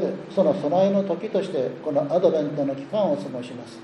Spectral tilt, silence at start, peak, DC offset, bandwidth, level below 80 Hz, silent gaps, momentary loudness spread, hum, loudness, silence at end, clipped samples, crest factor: -7.5 dB/octave; 0 s; -6 dBFS; under 0.1%; 10.5 kHz; -72 dBFS; none; 7 LU; none; -23 LUFS; 0 s; under 0.1%; 16 dB